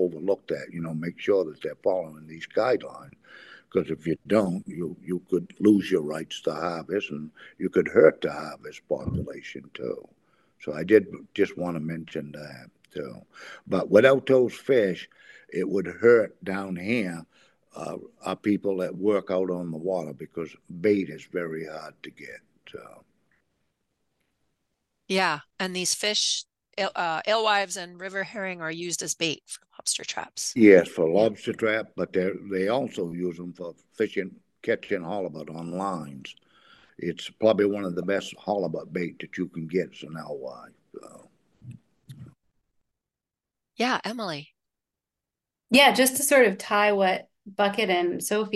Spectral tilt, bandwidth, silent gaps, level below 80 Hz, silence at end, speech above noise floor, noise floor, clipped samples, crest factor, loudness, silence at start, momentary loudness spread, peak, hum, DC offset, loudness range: -4 dB/octave; 12.5 kHz; none; -64 dBFS; 0 s; 63 dB; -89 dBFS; under 0.1%; 24 dB; -25 LUFS; 0 s; 19 LU; -2 dBFS; none; under 0.1%; 11 LU